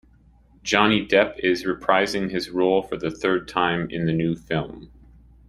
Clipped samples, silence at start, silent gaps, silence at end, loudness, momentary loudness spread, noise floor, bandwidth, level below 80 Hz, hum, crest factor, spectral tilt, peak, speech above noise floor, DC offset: under 0.1%; 0.65 s; none; 0.6 s; -22 LUFS; 9 LU; -54 dBFS; 14.5 kHz; -50 dBFS; none; 22 dB; -5 dB/octave; -2 dBFS; 32 dB; under 0.1%